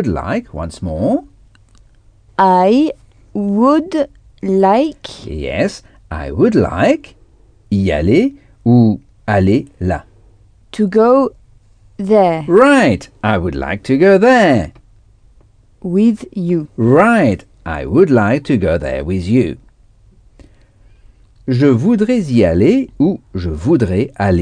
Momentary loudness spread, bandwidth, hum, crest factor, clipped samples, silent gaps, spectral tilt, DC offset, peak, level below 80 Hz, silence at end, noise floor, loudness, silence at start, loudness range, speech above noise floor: 14 LU; 10 kHz; none; 14 dB; under 0.1%; none; -7.5 dB/octave; under 0.1%; 0 dBFS; -36 dBFS; 0 s; -48 dBFS; -14 LUFS; 0 s; 4 LU; 35 dB